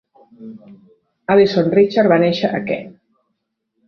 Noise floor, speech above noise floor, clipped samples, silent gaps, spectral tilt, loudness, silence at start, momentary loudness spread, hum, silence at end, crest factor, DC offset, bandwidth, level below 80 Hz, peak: -73 dBFS; 57 dB; under 0.1%; none; -7.5 dB/octave; -15 LUFS; 0.4 s; 23 LU; none; 0.95 s; 16 dB; under 0.1%; 6.6 kHz; -58 dBFS; -2 dBFS